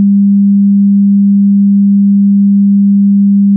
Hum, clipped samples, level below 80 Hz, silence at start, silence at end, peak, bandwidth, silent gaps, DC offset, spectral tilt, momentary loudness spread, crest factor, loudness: none; under 0.1%; -66 dBFS; 0 s; 0 s; -4 dBFS; 0.3 kHz; none; under 0.1%; -20.5 dB/octave; 0 LU; 4 dB; -7 LUFS